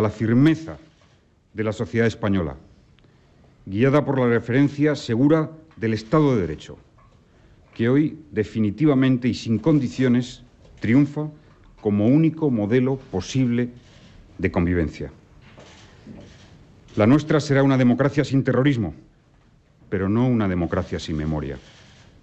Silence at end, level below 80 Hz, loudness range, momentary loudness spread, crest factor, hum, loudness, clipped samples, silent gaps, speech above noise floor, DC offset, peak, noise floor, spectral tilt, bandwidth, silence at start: 0.65 s; -50 dBFS; 5 LU; 12 LU; 16 dB; none; -21 LUFS; under 0.1%; none; 37 dB; under 0.1%; -6 dBFS; -57 dBFS; -7.5 dB/octave; 8.2 kHz; 0 s